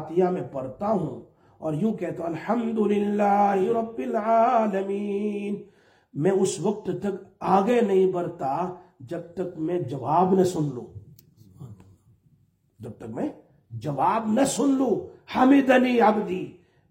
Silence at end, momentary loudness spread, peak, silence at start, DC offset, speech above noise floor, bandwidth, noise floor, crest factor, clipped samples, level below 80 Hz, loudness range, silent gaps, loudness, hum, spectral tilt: 0.4 s; 15 LU; -6 dBFS; 0 s; under 0.1%; 40 dB; 16 kHz; -64 dBFS; 18 dB; under 0.1%; -64 dBFS; 7 LU; none; -24 LUFS; none; -6.5 dB/octave